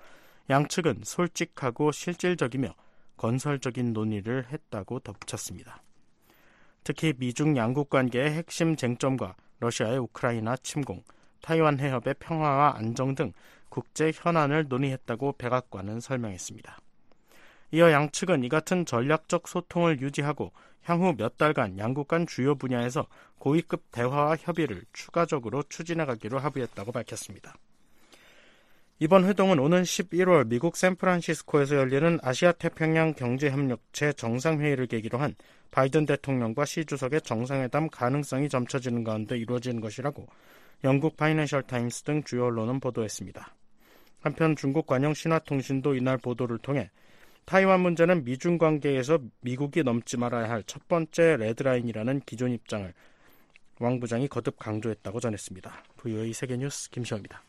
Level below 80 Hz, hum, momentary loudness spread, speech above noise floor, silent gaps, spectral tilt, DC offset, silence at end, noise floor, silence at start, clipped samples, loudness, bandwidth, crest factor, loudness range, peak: -62 dBFS; none; 12 LU; 32 dB; none; -6 dB/octave; under 0.1%; 0.1 s; -60 dBFS; 0 s; under 0.1%; -28 LUFS; 13.5 kHz; 22 dB; 7 LU; -6 dBFS